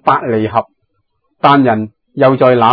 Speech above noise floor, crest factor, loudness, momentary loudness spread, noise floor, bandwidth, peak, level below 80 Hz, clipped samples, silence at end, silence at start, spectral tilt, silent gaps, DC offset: 55 dB; 12 dB; -12 LUFS; 10 LU; -65 dBFS; 5.4 kHz; 0 dBFS; -56 dBFS; 0.3%; 0 s; 0.05 s; -9.5 dB/octave; none; under 0.1%